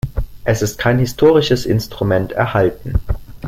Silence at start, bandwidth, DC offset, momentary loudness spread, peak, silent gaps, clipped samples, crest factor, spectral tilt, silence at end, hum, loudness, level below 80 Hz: 0.05 s; 16.5 kHz; under 0.1%; 10 LU; -2 dBFS; none; under 0.1%; 14 dB; -6 dB/octave; 0 s; none; -16 LUFS; -28 dBFS